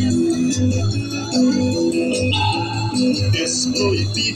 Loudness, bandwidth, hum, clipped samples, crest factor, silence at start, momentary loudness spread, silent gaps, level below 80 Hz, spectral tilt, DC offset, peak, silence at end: -18 LUFS; 12.5 kHz; none; under 0.1%; 12 dB; 0 s; 4 LU; none; -44 dBFS; -4.5 dB/octave; under 0.1%; -6 dBFS; 0 s